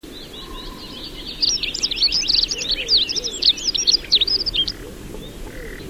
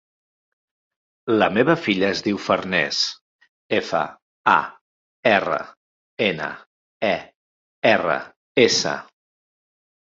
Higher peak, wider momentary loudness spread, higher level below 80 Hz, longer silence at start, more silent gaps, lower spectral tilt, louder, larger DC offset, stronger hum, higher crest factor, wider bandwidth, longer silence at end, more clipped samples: about the same, -4 dBFS vs -2 dBFS; first, 20 LU vs 12 LU; first, -40 dBFS vs -60 dBFS; second, 0.05 s vs 1.25 s; second, none vs 3.21-3.39 s, 3.49-3.70 s, 4.22-4.44 s, 4.81-5.23 s, 5.77-6.17 s, 6.66-7.00 s, 7.35-7.82 s, 8.36-8.55 s; second, -0.5 dB/octave vs -4 dB/octave; first, -17 LUFS vs -21 LUFS; first, 0.3% vs under 0.1%; neither; about the same, 18 dB vs 22 dB; first, 16 kHz vs 7.8 kHz; second, 0 s vs 1.15 s; neither